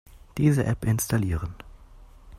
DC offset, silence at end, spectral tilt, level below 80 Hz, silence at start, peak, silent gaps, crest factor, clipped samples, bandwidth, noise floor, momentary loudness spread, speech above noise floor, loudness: under 0.1%; 0 s; -6.5 dB/octave; -42 dBFS; 0.1 s; -10 dBFS; none; 18 dB; under 0.1%; 16 kHz; -49 dBFS; 16 LU; 25 dB; -25 LUFS